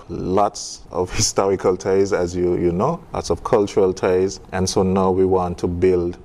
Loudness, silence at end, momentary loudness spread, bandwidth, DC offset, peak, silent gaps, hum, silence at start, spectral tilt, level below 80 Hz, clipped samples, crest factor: -19 LUFS; 0 s; 7 LU; 13 kHz; under 0.1%; -4 dBFS; none; none; 0 s; -5 dB/octave; -42 dBFS; under 0.1%; 14 dB